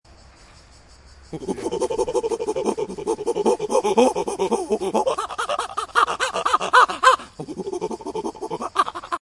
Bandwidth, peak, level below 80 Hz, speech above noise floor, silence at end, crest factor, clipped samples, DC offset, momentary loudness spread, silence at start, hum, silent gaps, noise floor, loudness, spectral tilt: 11.5 kHz; -2 dBFS; -52 dBFS; 27 dB; 0.15 s; 22 dB; under 0.1%; under 0.1%; 13 LU; 1.2 s; none; none; -48 dBFS; -22 LUFS; -3 dB/octave